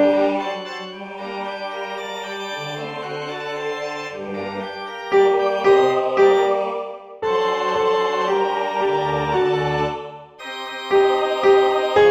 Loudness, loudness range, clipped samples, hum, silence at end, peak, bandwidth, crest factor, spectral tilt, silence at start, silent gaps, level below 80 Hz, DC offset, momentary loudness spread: -20 LUFS; 9 LU; under 0.1%; none; 0 s; -4 dBFS; 8 kHz; 16 dB; -5 dB/octave; 0 s; none; -54 dBFS; under 0.1%; 14 LU